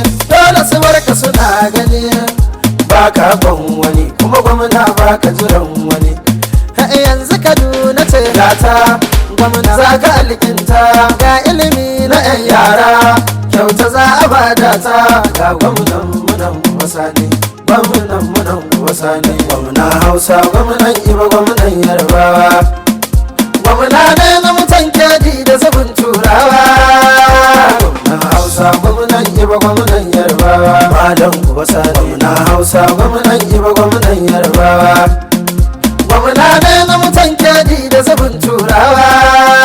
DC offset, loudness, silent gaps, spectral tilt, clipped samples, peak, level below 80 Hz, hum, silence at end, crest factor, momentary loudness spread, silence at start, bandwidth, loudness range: under 0.1%; -7 LUFS; none; -4.5 dB/octave; 0.9%; 0 dBFS; -16 dBFS; none; 0 s; 8 dB; 7 LU; 0 s; over 20 kHz; 4 LU